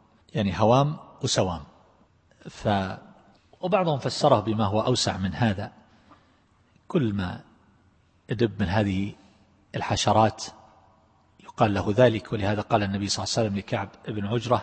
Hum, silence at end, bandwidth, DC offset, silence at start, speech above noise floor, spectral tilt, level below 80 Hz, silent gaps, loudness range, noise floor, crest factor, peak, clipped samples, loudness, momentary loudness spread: none; 0 s; 8.8 kHz; under 0.1%; 0.35 s; 38 dB; -5.5 dB/octave; -54 dBFS; none; 4 LU; -62 dBFS; 22 dB; -4 dBFS; under 0.1%; -25 LUFS; 14 LU